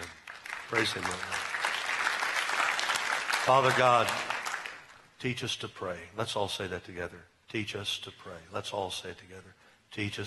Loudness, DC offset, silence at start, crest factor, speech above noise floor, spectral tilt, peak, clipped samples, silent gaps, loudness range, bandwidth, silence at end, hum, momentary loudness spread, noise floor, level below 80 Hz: -31 LUFS; under 0.1%; 0 s; 26 dB; 20 dB; -3 dB/octave; -8 dBFS; under 0.1%; none; 10 LU; 12 kHz; 0 s; none; 18 LU; -51 dBFS; -68 dBFS